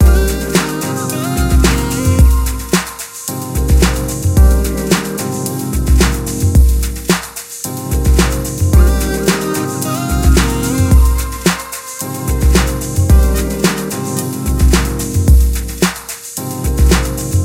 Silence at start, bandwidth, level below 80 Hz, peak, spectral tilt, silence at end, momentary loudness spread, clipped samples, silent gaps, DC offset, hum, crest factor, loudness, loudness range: 0 s; 16.5 kHz; -14 dBFS; 0 dBFS; -5 dB/octave; 0 s; 9 LU; under 0.1%; none; under 0.1%; none; 12 dB; -14 LUFS; 2 LU